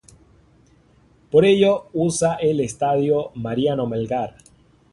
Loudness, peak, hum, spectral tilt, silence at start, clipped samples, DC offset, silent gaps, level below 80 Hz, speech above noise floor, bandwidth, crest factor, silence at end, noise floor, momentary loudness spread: -20 LUFS; -2 dBFS; none; -5.5 dB/octave; 1.35 s; under 0.1%; under 0.1%; none; -54 dBFS; 36 dB; 11.5 kHz; 18 dB; 0.65 s; -55 dBFS; 10 LU